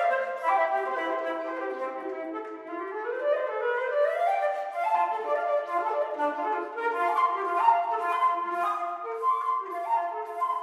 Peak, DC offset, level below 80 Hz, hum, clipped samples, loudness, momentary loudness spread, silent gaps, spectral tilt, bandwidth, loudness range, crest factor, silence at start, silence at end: -8 dBFS; under 0.1%; under -90 dBFS; none; under 0.1%; -28 LUFS; 9 LU; none; -2.5 dB/octave; 13 kHz; 4 LU; 18 dB; 0 s; 0 s